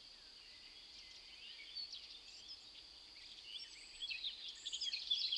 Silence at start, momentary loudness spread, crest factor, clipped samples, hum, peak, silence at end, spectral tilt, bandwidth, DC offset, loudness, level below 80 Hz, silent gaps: 0 s; 14 LU; 22 dB; under 0.1%; none; -28 dBFS; 0 s; 1.5 dB/octave; 12 kHz; under 0.1%; -47 LUFS; -76 dBFS; none